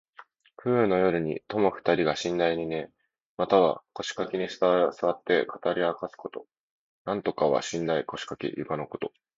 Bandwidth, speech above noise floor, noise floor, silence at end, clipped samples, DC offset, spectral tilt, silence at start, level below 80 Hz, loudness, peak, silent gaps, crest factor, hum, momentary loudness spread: 7.8 kHz; 27 dB; -54 dBFS; 0.3 s; under 0.1%; under 0.1%; -5.5 dB/octave; 0.2 s; -62 dBFS; -27 LUFS; -8 dBFS; 3.26-3.37 s, 6.60-7.05 s; 20 dB; none; 12 LU